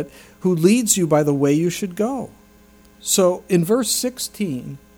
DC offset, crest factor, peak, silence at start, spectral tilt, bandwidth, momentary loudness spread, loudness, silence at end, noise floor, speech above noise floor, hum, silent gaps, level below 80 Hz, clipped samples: under 0.1%; 18 dB; -2 dBFS; 0 s; -4.5 dB/octave; 19 kHz; 13 LU; -19 LUFS; 0.2 s; -49 dBFS; 30 dB; none; none; -56 dBFS; under 0.1%